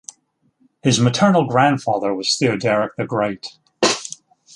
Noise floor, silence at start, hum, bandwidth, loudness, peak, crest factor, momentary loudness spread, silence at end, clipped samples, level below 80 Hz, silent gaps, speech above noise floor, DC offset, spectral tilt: -63 dBFS; 0.85 s; none; 11.5 kHz; -18 LUFS; -2 dBFS; 18 dB; 18 LU; 0.45 s; under 0.1%; -58 dBFS; none; 45 dB; under 0.1%; -4.5 dB/octave